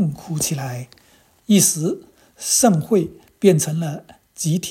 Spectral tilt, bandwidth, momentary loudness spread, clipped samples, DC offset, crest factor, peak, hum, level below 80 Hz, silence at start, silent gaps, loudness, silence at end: -4.5 dB/octave; 16.5 kHz; 15 LU; under 0.1%; under 0.1%; 20 dB; 0 dBFS; none; -56 dBFS; 0 s; none; -19 LUFS; 0 s